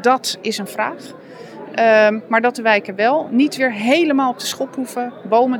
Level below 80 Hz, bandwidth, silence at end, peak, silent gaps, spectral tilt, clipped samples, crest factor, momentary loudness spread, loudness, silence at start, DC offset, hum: -78 dBFS; 18.5 kHz; 0 s; -2 dBFS; none; -3.5 dB/octave; under 0.1%; 16 dB; 13 LU; -17 LUFS; 0 s; under 0.1%; none